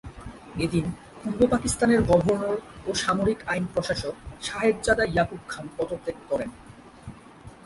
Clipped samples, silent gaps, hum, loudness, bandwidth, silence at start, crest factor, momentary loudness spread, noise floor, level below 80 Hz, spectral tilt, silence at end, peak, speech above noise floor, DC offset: under 0.1%; none; none; -26 LUFS; 11.5 kHz; 0.05 s; 20 dB; 16 LU; -47 dBFS; -44 dBFS; -5 dB/octave; 0.1 s; -6 dBFS; 22 dB; under 0.1%